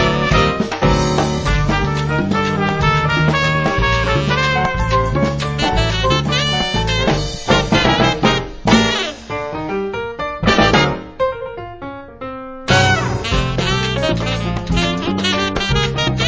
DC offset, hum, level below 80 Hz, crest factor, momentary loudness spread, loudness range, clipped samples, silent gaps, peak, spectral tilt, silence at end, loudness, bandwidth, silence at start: under 0.1%; none; -28 dBFS; 16 dB; 10 LU; 3 LU; under 0.1%; none; 0 dBFS; -5 dB/octave; 0 s; -16 LUFS; 8 kHz; 0 s